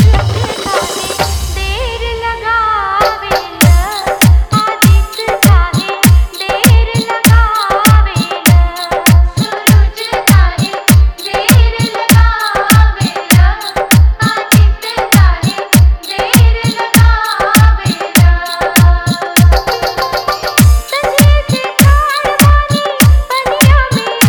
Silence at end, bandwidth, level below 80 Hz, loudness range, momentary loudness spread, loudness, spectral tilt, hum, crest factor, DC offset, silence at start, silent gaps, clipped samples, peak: 0 s; over 20 kHz; -14 dBFS; 1 LU; 7 LU; -10 LUFS; -4.5 dB/octave; none; 8 dB; under 0.1%; 0 s; none; 1%; 0 dBFS